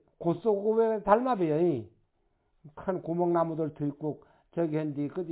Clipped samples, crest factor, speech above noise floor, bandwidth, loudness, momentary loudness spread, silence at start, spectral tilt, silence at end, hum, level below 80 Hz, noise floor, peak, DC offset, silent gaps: under 0.1%; 22 dB; 44 dB; 4 kHz; -29 LUFS; 12 LU; 0.2 s; -8 dB/octave; 0 s; none; -66 dBFS; -73 dBFS; -8 dBFS; under 0.1%; none